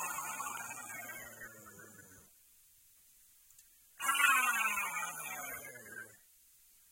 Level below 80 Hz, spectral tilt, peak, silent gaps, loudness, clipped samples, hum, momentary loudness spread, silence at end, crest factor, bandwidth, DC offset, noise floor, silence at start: -78 dBFS; 0.5 dB/octave; -14 dBFS; none; -34 LUFS; under 0.1%; none; 26 LU; 0.75 s; 24 dB; 16.5 kHz; under 0.1%; -65 dBFS; 0 s